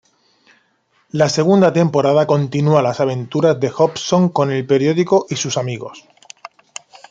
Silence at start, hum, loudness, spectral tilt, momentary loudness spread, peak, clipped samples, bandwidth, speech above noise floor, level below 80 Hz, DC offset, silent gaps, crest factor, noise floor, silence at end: 1.15 s; none; -16 LUFS; -6 dB/octave; 21 LU; -2 dBFS; under 0.1%; 9.2 kHz; 46 dB; -60 dBFS; under 0.1%; none; 16 dB; -61 dBFS; 0.65 s